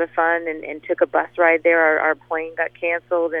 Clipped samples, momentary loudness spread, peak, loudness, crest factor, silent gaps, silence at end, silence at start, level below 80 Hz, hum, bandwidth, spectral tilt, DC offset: under 0.1%; 11 LU; -2 dBFS; -19 LUFS; 18 dB; none; 0 s; 0 s; -66 dBFS; 60 Hz at -55 dBFS; 3.7 kHz; -7.5 dB/octave; under 0.1%